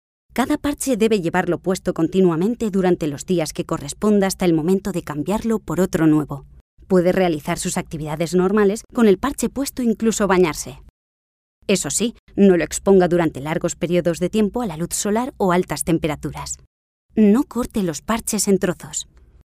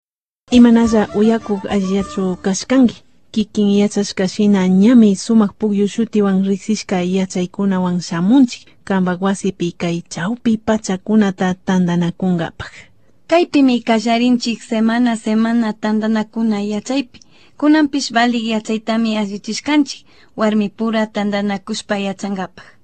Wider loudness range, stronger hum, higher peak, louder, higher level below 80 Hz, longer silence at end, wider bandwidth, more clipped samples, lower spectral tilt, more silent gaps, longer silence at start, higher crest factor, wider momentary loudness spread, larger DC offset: about the same, 2 LU vs 4 LU; neither; about the same, -2 dBFS vs 0 dBFS; second, -20 LUFS vs -16 LUFS; about the same, -44 dBFS vs -48 dBFS; first, 0.5 s vs 0.2 s; first, 16 kHz vs 9 kHz; neither; about the same, -5.5 dB/octave vs -6 dB/octave; first, 6.61-6.77 s, 10.90-11.62 s, 12.19-12.27 s, 16.67-17.09 s vs none; second, 0.35 s vs 0.5 s; about the same, 18 dB vs 16 dB; about the same, 10 LU vs 9 LU; second, under 0.1% vs 0.4%